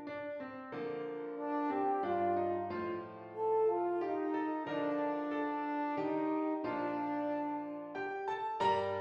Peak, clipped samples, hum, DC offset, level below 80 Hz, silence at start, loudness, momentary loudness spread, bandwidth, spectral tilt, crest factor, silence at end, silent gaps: -22 dBFS; under 0.1%; none; under 0.1%; -80 dBFS; 0 s; -36 LUFS; 9 LU; 8 kHz; -7 dB/octave; 14 dB; 0 s; none